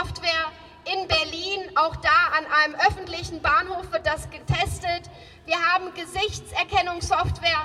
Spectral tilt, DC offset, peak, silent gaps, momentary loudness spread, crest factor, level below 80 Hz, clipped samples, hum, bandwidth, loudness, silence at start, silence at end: -3.5 dB/octave; under 0.1%; -8 dBFS; none; 12 LU; 18 dB; -44 dBFS; under 0.1%; none; 14 kHz; -23 LUFS; 0 s; 0 s